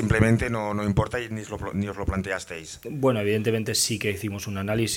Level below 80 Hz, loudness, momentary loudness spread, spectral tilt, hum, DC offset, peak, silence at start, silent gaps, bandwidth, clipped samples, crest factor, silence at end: -42 dBFS; -26 LUFS; 10 LU; -5 dB/octave; none; under 0.1%; -4 dBFS; 0 s; none; 17 kHz; under 0.1%; 22 dB; 0 s